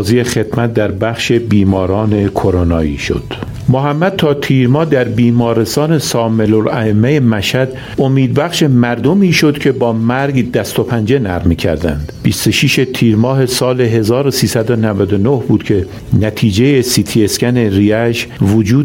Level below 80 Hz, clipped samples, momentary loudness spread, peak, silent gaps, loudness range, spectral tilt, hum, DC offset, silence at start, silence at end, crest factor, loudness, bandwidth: -34 dBFS; under 0.1%; 5 LU; 0 dBFS; none; 2 LU; -6 dB/octave; none; under 0.1%; 0 s; 0 s; 12 dB; -12 LUFS; 16.5 kHz